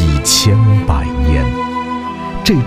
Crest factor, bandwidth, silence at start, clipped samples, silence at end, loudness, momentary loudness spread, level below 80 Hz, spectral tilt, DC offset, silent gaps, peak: 12 dB; 16 kHz; 0 s; under 0.1%; 0 s; -14 LUFS; 11 LU; -20 dBFS; -4.5 dB/octave; under 0.1%; none; 0 dBFS